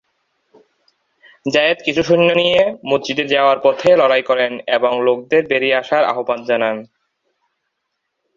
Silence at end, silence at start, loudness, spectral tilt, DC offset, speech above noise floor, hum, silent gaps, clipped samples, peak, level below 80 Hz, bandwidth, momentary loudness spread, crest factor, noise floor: 1.55 s; 1.45 s; -15 LUFS; -5 dB/octave; under 0.1%; 59 dB; none; none; under 0.1%; -2 dBFS; -56 dBFS; 7.4 kHz; 6 LU; 16 dB; -74 dBFS